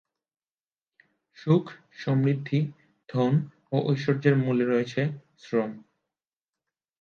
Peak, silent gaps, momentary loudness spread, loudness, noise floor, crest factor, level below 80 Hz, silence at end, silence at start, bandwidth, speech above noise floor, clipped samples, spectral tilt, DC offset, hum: -8 dBFS; none; 12 LU; -26 LUFS; under -90 dBFS; 20 dB; -72 dBFS; 1.2 s; 1.4 s; 6.8 kHz; over 65 dB; under 0.1%; -8.5 dB/octave; under 0.1%; none